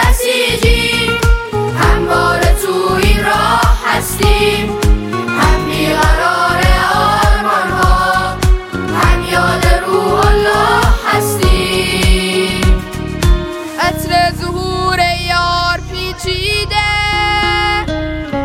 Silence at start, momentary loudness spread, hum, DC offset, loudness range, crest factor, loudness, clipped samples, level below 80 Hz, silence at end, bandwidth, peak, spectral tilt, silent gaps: 0 s; 5 LU; none; under 0.1%; 2 LU; 12 dB; -13 LUFS; under 0.1%; -16 dBFS; 0 s; 16.5 kHz; 0 dBFS; -4.5 dB/octave; none